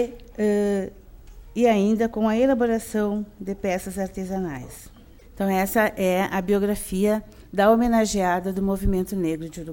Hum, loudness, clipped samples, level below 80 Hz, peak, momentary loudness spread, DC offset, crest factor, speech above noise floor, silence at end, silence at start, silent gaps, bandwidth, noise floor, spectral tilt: none; -23 LUFS; under 0.1%; -40 dBFS; -6 dBFS; 11 LU; under 0.1%; 18 dB; 21 dB; 0 s; 0 s; none; 17.5 kHz; -44 dBFS; -6 dB/octave